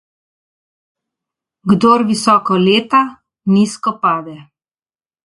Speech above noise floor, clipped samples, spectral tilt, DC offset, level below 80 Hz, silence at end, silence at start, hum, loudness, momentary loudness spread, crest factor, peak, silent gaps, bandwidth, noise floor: over 77 dB; under 0.1%; -5.5 dB/octave; under 0.1%; -56 dBFS; 0.85 s; 1.65 s; none; -14 LUFS; 12 LU; 16 dB; 0 dBFS; none; 11.5 kHz; under -90 dBFS